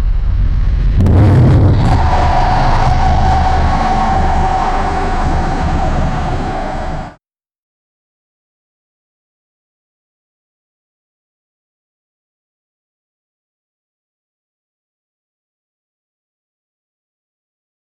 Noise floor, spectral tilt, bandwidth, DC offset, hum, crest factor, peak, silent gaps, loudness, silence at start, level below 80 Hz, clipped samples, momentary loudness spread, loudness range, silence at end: -52 dBFS; -7.5 dB/octave; 8.8 kHz; under 0.1%; none; 12 dB; -2 dBFS; none; -13 LUFS; 0 s; -18 dBFS; under 0.1%; 10 LU; 13 LU; 10.8 s